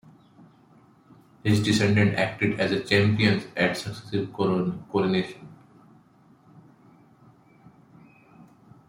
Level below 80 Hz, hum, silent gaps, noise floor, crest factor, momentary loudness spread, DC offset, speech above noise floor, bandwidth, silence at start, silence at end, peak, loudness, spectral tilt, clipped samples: -60 dBFS; none; none; -57 dBFS; 20 dB; 10 LU; under 0.1%; 33 dB; 16 kHz; 1.45 s; 3.35 s; -6 dBFS; -24 LUFS; -6 dB/octave; under 0.1%